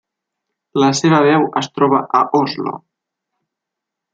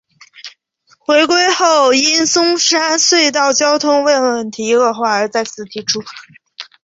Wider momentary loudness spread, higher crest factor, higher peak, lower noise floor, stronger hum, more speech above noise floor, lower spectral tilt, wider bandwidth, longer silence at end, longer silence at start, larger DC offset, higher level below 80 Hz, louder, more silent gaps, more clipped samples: second, 12 LU vs 15 LU; about the same, 16 dB vs 14 dB; about the same, -2 dBFS vs 0 dBFS; first, -82 dBFS vs -55 dBFS; neither; first, 67 dB vs 42 dB; first, -5.5 dB/octave vs -1 dB/octave; first, 9.2 kHz vs 8.2 kHz; first, 1.35 s vs 0.2 s; first, 0.75 s vs 0.45 s; neither; about the same, -62 dBFS vs -62 dBFS; second, -15 LUFS vs -12 LUFS; neither; neither